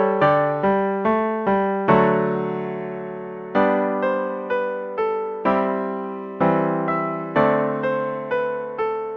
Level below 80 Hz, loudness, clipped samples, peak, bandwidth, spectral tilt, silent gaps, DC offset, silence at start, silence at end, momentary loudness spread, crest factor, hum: -58 dBFS; -22 LUFS; under 0.1%; -4 dBFS; 6.2 kHz; -9 dB/octave; none; under 0.1%; 0 s; 0 s; 10 LU; 18 dB; none